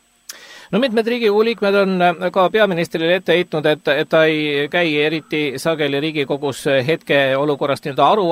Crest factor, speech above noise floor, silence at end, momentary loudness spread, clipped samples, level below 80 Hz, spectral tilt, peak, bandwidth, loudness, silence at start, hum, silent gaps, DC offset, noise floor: 16 dB; 23 dB; 0 s; 6 LU; under 0.1%; -62 dBFS; -5.5 dB/octave; -2 dBFS; 16 kHz; -17 LUFS; 0.3 s; none; none; under 0.1%; -40 dBFS